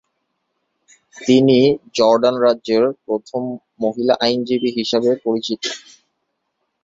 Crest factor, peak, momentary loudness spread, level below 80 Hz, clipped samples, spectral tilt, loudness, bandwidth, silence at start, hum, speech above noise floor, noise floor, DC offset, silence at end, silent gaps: 16 dB; -2 dBFS; 12 LU; -62 dBFS; under 0.1%; -5.5 dB/octave; -17 LUFS; 7.8 kHz; 1.15 s; none; 56 dB; -73 dBFS; under 0.1%; 1.05 s; none